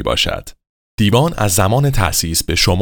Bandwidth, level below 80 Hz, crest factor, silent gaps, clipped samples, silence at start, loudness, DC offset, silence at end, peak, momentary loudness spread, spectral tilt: over 20 kHz; -28 dBFS; 16 dB; 0.69-0.98 s; under 0.1%; 0 s; -15 LUFS; under 0.1%; 0 s; 0 dBFS; 5 LU; -4 dB/octave